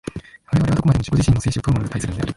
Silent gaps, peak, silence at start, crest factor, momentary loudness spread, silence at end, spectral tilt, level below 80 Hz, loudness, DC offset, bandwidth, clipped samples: none; -4 dBFS; 0.05 s; 14 dB; 9 LU; 0.05 s; -6.5 dB/octave; -32 dBFS; -19 LUFS; under 0.1%; 11.5 kHz; under 0.1%